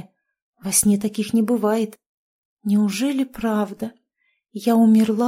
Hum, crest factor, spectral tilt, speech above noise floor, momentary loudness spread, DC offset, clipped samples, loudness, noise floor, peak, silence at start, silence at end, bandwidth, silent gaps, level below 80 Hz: none; 18 dB; -5 dB/octave; 51 dB; 16 LU; under 0.1%; under 0.1%; -20 LUFS; -70 dBFS; -4 dBFS; 0.65 s; 0 s; 16 kHz; 2.06-2.57 s; -56 dBFS